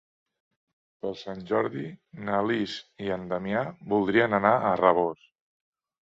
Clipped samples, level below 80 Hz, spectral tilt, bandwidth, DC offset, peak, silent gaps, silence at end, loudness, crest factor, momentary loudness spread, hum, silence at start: under 0.1%; -64 dBFS; -7 dB/octave; 7.8 kHz; under 0.1%; -4 dBFS; none; 0.9 s; -26 LUFS; 24 dB; 15 LU; none; 1.05 s